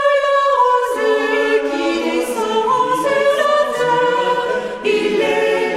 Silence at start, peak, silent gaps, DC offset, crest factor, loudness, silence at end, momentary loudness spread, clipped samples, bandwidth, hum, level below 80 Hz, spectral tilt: 0 s; -4 dBFS; none; under 0.1%; 12 dB; -16 LUFS; 0 s; 4 LU; under 0.1%; 15 kHz; none; -54 dBFS; -3.5 dB/octave